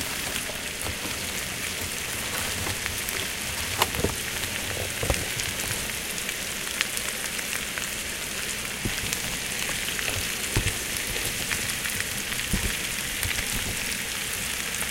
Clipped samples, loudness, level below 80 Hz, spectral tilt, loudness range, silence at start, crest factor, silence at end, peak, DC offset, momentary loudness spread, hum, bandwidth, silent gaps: under 0.1%; -27 LUFS; -42 dBFS; -1.5 dB/octave; 2 LU; 0 s; 26 dB; 0 s; -4 dBFS; under 0.1%; 3 LU; none; 17 kHz; none